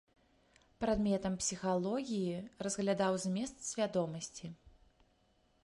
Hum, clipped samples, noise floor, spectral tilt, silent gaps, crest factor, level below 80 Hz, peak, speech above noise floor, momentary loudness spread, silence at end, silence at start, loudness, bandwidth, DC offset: none; under 0.1%; -73 dBFS; -5 dB/octave; none; 18 dB; -60 dBFS; -20 dBFS; 37 dB; 8 LU; 0.95 s; 0.8 s; -36 LUFS; 11.5 kHz; under 0.1%